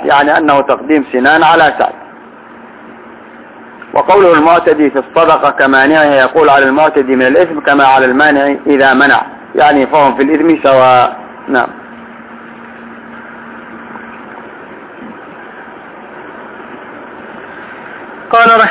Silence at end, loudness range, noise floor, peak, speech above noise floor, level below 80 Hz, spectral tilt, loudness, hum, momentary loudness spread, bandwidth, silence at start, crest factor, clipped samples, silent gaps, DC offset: 0 s; 21 LU; -33 dBFS; 0 dBFS; 26 dB; -50 dBFS; -8.5 dB/octave; -8 LUFS; none; 24 LU; 4 kHz; 0 s; 10 dB; 1%; none; under 0.1%